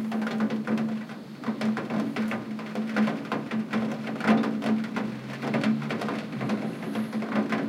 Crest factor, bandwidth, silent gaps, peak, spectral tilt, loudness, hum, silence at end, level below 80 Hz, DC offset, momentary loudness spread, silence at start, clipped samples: 18 dB; 12 kHz; none; -10 dBFS; -6.5 dB/octave; -29 LUFS; none; 0 s; -72 dBFS; under 0.1%; 7 LU; 0 s; under 0.1%